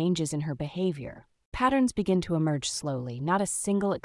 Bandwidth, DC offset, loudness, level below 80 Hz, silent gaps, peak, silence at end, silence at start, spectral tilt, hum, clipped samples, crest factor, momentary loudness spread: 12 kHz; under 0.1%; -28 LUFS; -52 dBFS; 1.45-1.52 s; -12 dBFS; 0.05 s; 0 s; -5 dB/octave; none; under 0.1%; 16 dB; 8 LU